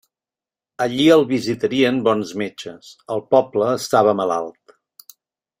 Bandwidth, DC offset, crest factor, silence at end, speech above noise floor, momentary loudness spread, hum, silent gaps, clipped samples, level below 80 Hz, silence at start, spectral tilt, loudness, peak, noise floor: 16 kHz; under 0.1%; 18 dB; 1.1 s; over 72 dB; 14 LU; none; none; under 0.1%; -62 dBFS; 0.8 s; -5 dB/octave; -18 LUFS; -2 dBFS; under -90 dBFS